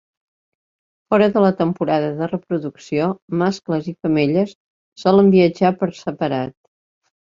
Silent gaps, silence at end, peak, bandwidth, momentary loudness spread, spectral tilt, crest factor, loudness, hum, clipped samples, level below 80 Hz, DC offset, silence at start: 3.22-3.28 s, 4.55-4.92 s; 0.9 s; -2 dBFS; 7.4 kHz; 11 LU; -7.5 dB/octave; 18 dB; -18 LUFS; none; under 0.1%; -58 dBFS; under 0.1%; 1.1 s